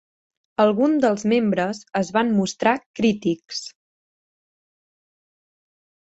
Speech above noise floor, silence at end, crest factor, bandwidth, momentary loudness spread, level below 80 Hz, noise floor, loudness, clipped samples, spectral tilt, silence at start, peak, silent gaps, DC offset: over 70 dB; 2.45 s; 20 dB; 8.2 kHz; 12 LU; -64 dBFS; under -90 dBFS; -21 LUFS; under 0.1%; -5.5 dB/octave; 0.6 s; -4 dBFS; 2.86-2.94 s; under 0.1%